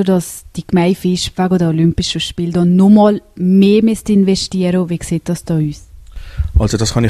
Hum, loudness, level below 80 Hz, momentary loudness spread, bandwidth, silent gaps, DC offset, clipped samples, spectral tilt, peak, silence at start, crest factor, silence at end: none; -14 LUFS; -28 dBFS; 10 LU; 13.5 kHz; none; under 0.1%; under 0.1%; -6.5 dB/octave; 0 dBFS; 0 s; 14 dB; 0 s